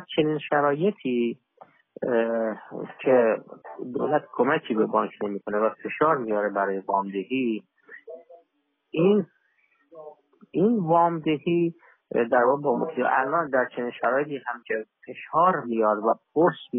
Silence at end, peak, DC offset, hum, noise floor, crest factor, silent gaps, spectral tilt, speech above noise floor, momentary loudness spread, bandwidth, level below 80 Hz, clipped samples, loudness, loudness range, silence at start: 0 s; -8 dBFS; under 0.1%; none; -73 dBFS; 18 dB; none; -5 dB/octave; 49 dB; 12 LU; 3.8 kHz; -72 dBFS; under 0.1%; -25 LUFS; 4 LU; 0 s